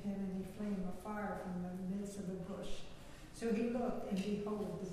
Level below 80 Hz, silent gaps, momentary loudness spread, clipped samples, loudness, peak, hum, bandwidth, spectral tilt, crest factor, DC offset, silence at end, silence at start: -58 dBFS; none; 11 LU; under 0.1%; -42 LUFS; -26 dBFS; none; 14.5 kHz; -7 dB/octave; 14 dB; under 0.1%; 0 s; 0 s